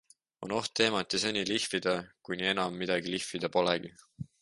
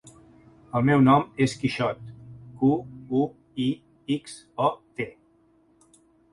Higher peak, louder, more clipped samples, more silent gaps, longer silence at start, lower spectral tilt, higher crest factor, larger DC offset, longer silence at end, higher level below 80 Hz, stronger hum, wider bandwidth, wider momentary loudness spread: second, -10 dBFS vs -6 dBFS; second, -31 LUFS vs -25 LUFS; neither; neither; second, 0.4 s vs 0.75 s; second, -3.5 dB/octave vs -7 dB/octave; about the same, 22 dB vs 20 dB; neither; second, 0.2 s vs 1.25 s; second, -66 dBFS vs -58 dBFS; neither; about the same, 11.5 kHz vs 11.5 kHz; second, 12 LU vs 18 LU